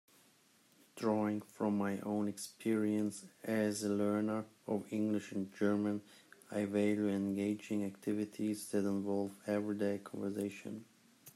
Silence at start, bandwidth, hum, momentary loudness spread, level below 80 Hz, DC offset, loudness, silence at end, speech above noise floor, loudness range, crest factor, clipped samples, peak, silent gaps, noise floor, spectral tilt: 0.95 s; 14 kHz; none; 7 LU; -82 dBFS; under 0.1%; -37 LUFS; 0.05 s; 32 dB; 2 LU; 16 dB; under 0.1%; -20 dBFS; none; -69 dBFS; -6 dB/octave